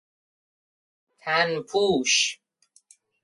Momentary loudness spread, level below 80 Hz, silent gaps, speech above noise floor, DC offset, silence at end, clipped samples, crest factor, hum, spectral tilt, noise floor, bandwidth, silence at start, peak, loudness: 13 LU; -66 dBFS; none; 40 dB; under 0.1%; 0.9 s; under 0.1%; 20 dB; none; -2 dB/octave; -64 dBFS; 11.5 kHz; 1.25 s; -8 dBFS; -23 LUFS